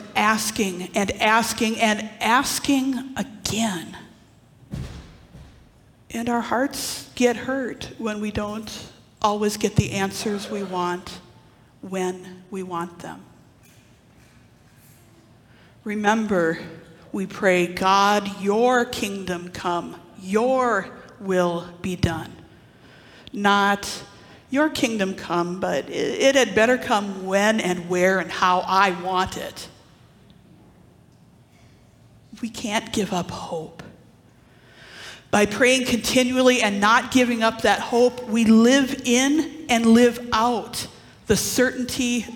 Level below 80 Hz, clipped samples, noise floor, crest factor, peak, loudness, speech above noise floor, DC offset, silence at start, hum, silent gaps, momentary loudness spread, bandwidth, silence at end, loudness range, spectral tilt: -52 dBFS; under 0.1%; -53 dBFS; 18 dB; -4 dBFS; -21 LUFS; 31 dB; under 0.1%; 0 s; none; none; 17 LU; 18 kHz; 0 s; 13 LU; -4 dB/octave